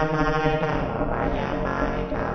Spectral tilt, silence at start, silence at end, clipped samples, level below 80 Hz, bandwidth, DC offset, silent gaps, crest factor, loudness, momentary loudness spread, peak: -7.5 dB/octave; 0 s; 0 s; under 0.1%; -32 dBFS; 6.6 kHz; under 0.1%; none; 18 dB; -25 LUFS; 4 LU; -6 dBFS